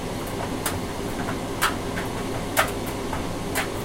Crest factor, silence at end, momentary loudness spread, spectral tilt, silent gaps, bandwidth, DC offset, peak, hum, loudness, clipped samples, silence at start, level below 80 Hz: 22 dB; 0 s; 6 LU; -4 dB/octave; none; 17 kHz; under 0.1%; -4 dBFS; none; -27 LUFS; under 0.1%; 0 s; -40 dBFS